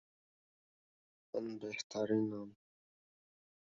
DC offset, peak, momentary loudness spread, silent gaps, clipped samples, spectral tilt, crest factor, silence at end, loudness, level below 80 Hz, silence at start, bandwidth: under 0.1%; -22 dBFS; 12 LU; 1.84-1.90 s; under 0.1%; -5 dB/octave; 22 dB; 1.1 s; -40 LUFS; -84 dBFS; 1.35 s; 7.4 kHz